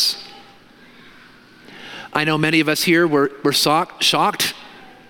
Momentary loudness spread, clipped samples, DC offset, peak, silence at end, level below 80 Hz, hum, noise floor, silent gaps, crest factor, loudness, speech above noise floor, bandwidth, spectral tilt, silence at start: 20 LU; under 0.1%; under 0.1%; 0 dBFS; 0.25 s; -62 dBFS; none; -47 dBFS; none; 20 dB; -17 LUFS; 29 dB; 17 kHz; -3.5 dB/octave; 0 s